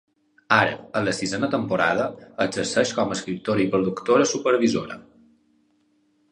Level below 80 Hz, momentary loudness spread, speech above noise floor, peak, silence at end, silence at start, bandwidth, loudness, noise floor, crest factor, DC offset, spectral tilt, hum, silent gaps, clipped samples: -58 dBFS; 8 LU; 43 dB; -2 dBFS; 1.3 s; 0.5 s; 11 kHz; -23 LUFS; -65 dBFS; 22 dB; under 0.1%; -4.5 dB/octave; none; none; under 0.1%